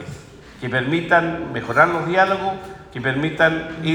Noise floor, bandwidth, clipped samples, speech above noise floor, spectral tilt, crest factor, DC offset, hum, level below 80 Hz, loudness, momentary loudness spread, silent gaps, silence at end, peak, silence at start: -40 dBFS; 17.5 kHz; under 0.1%; 20 dB; -6 dB/octave; 20 dB; under 0.1%; none; -50 dBFS; -19 LUFS; 16 LU; none; 0 s; -2 dBFS; 0 s